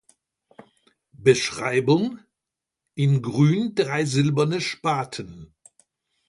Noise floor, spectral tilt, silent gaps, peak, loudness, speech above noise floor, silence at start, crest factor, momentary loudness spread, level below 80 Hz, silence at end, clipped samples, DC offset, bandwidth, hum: -86 dBFS; -6 dB/octave; none; -4 dBFS; -22 LUFS; 65 dB; 1.2 s; 20 dB; 13 LU; -60 dBFS; 0.85 s; under 0.1%; under 0.1%; 11.5 kHz; none